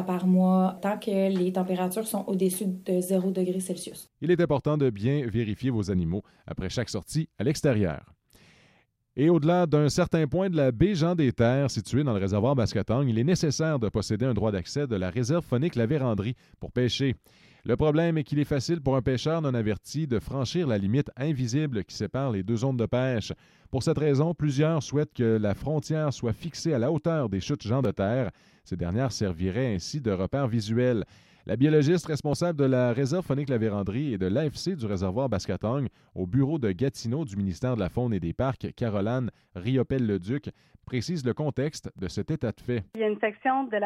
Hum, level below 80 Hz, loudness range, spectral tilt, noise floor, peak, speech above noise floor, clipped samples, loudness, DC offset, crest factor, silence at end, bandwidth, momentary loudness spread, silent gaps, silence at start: none; -52 dBFS; 4 LU; -7 dB/octave; -65 dBFS; -10 dBFS; 39 dB; under 0.1%; -27 LUFS; under 0.1%; 16 dB; 0 s; 15 kHz; 8 LU; none; 0 s